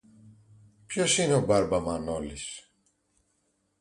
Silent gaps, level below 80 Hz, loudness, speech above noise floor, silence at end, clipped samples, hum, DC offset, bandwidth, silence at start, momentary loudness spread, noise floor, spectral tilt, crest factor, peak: none; -52 dBFS; -27 LUFS; 47 dB; 1.2 s; under 0.1%; none; under 0.1%; 11.5 kHz; 0.25 s; 15 LU; -74 dBFS; -4 dB/octave; 18 dB; -12 dBFS